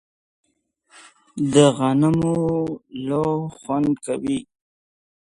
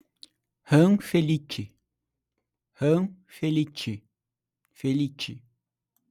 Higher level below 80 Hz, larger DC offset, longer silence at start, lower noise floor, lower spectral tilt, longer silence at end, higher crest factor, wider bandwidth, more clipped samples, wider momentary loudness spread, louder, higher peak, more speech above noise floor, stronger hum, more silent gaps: first, -54 dBFS vs -66 dBFS; neither; first, 1.35 s vs 0.7 s; second, -66 dBFS vs -88 dBFS; about the same, -6.5 dB/octave vs -7 dB/octave; first, 1 s vs 0.7 s; about the same, 22 dB vs 20 dB; second, 11.5 kHz vs 15 kHz; neither; second, 12 LU vs 16 LU; first, -21 LUFS vs -26 LUFS; first, -2 dBFS vs -8 dBFS; second, 46 dB vs 63 dB; neither; neither